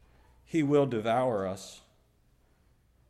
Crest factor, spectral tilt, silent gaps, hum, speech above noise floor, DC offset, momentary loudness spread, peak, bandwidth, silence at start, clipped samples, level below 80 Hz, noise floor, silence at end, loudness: 18 dB; -6.5 dB/octave; none; none; 38 dB; under 0.1%; 14 LU; -14 dBFS; 13 kHz; 0.5 s; under 0.1%; -64 dBFS; -66 dBFS; 1.3 s; -29 LUFS